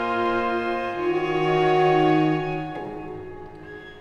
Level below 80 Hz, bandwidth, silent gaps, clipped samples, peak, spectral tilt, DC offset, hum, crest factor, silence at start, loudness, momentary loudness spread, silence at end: -50 dBFS; 7 kHz; none; under 0.1%; -8 dBFS; -7.5 dB/octave; under 0.1%; none; 14 dB; 0 s; -22 LUFS; 21 LU; 0 s